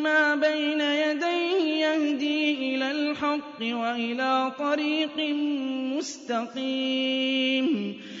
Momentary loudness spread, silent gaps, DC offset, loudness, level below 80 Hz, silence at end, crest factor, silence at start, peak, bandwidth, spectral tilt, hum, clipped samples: 6 LU; none; under 0.1%; -26 LUFS; -76 dBFS; 0 s; 14 dB; 0 s; -12 dBFS; 7.8 kHz; -3.5 dB/octave; none; under 0.1%